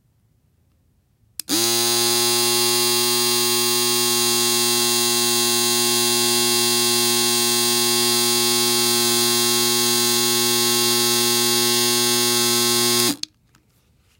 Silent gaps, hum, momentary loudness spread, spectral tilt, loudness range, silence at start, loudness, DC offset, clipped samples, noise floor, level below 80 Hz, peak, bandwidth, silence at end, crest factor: none; none; 1 LU; -1 dB/octave; 1 LU; 1.5 s; -16 LUFS; under 0.1%; under 0.1%; -62 dBFS; -64 dBFS; -2 dBFS; 16.5 kHz; 1.05 s; 18 dB